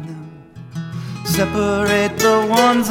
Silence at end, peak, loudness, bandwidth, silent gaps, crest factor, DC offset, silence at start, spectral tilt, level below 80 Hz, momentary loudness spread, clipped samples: 0 s; -2 dBFS; -16 LUFS; 18 kHz; none; 16 dB; under 0.1%; 0 s; -4.5 dB/octave; -44 dBFS; 19 LU; under 0.1%